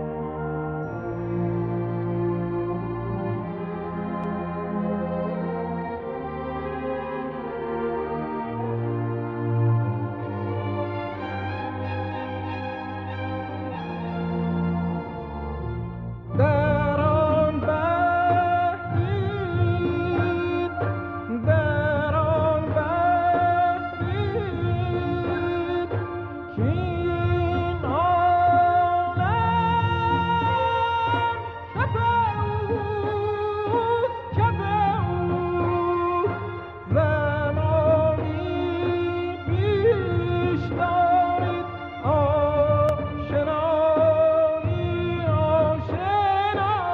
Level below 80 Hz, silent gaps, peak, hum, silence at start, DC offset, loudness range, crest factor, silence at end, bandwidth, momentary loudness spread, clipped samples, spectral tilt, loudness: -44 dBFS; none; -8 dBFS; none; 0 s; under 0.1%; 7 LU; 16 dB; 0 s; 5.2 kHz; 10 LU; under 0.1%; -9.5 dB/octave; -24 LUFS